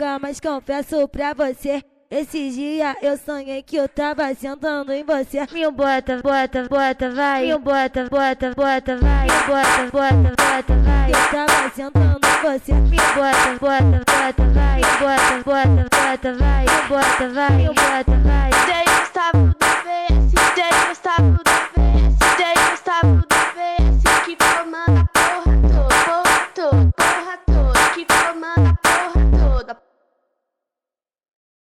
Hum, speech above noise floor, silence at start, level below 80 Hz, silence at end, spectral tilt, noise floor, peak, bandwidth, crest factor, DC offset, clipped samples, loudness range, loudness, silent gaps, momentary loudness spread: none; 73 dB; 0 s; -22 dBFS; 1.9 s; -4.5 dB/octave; -90 dBFS; -6 dBFS; 15.5 kHz; 10 dB; under 0.1%; under 0.1%; 7 LU; -17 LUFS; none; 8 LU